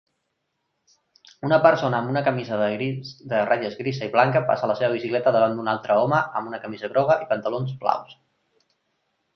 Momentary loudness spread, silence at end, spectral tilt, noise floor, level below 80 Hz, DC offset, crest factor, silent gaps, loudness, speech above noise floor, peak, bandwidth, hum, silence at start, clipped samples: 10 LU; 1.2 s; -7.5 dB/octave; -76 dBFS; -66 dBFS; under 0.1%; 20 dB; none; -23 LUFS; 54 dB; -2 dBFS; 6.4 kHz; none; 1.45 s; under 0.1%